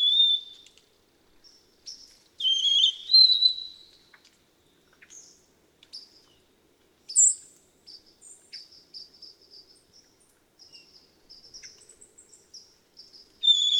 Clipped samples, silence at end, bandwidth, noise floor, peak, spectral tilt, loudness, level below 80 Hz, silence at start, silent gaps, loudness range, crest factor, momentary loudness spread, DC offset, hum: under 0.1%; 0 s; 17 kHz; -64 dBFS; -8 dBFS; 4 dB/octave; -20 LUFS; -76 dBFS; 0 s; none; 7 LU; 20 dB; 29 LU; under 0.1%; none